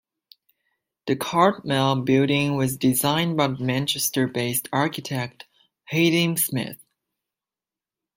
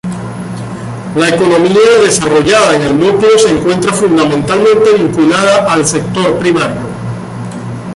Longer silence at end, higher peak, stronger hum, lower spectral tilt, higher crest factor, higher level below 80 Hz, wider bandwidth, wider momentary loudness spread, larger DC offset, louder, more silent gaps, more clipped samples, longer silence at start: first, 1.4 s vs 0 s; second, -4 dBFS vs 0 dBFS; neither; about the same, -4.5 dB/octave vs -4.5 dB/octave; first, 20 dB vs 10 dB; second, -62 dBFS vs -40 dBFS; first, 16.5 kHz vs 11.5 kHz; second, 9 LU vs 14 LU; neither; second, -22 LUFS vs -9 LUFS; neither; neither; first, 1.05 s vs 0.05 s